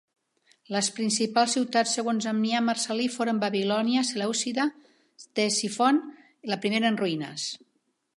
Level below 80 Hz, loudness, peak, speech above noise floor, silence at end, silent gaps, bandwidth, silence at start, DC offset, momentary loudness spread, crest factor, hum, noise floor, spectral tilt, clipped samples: -80 dBFS; -26 LUFS; -8 dBFS; 47 dB; 0.6 s; none; 11.5 kHz; 0.7 s; under 0.1%; 9 LU; 18 dB; none; -73 dBFS; -3 dB/octave; under 0.1%